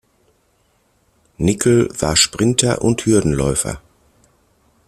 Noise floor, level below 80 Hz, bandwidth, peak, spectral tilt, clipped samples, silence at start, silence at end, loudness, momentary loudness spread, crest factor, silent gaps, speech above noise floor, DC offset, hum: -61 dBFS; -38 dBFS; 15 kHz; 0 dBFS; -4 dB/octave; under 0.1%; 1.4 s; 1.1 s; -16 LUFS; 7 LU; 18 dB; none; 45 dB; under 0.1%; none